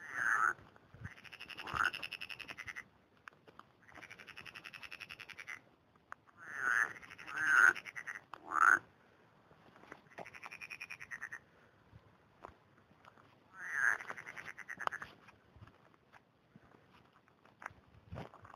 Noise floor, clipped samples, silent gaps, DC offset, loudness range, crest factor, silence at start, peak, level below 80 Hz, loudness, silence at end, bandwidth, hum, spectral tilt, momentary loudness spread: -68 dBFS; under 0.1%; none; under 0.1%; 18 LU; 26 dB; 0 s; -14 dBFS; -72 dBFS; -36 LUFS; 0.1 s; 15 kHz; none; -2 dB/octave; 26 LU